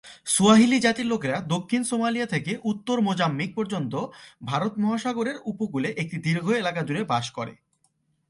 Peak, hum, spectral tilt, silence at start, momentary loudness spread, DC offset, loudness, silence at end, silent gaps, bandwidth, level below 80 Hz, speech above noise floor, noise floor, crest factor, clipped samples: -4 dBFS; none; -4.5 dB/octave; 0.05 s; 11 LU; under 0.1%; -24 LUFS; 0.75 s; none; 11.5 kHz; -64 dBFS; 45 dB; -70 dBFS; 20 dB; under 0.1%